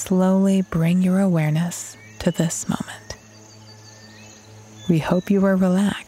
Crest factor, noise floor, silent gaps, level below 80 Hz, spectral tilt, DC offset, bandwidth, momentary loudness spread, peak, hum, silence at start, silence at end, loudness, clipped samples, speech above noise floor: 16 dB; -45 dBFS; none; -50 dBFS; -6.5 dB/octave; under 0.1%; 15 kHz; 16 LU; -4 dBFS; none; 0 s; 0.05 s; -20 LUFS; under 0.1%; 26 dB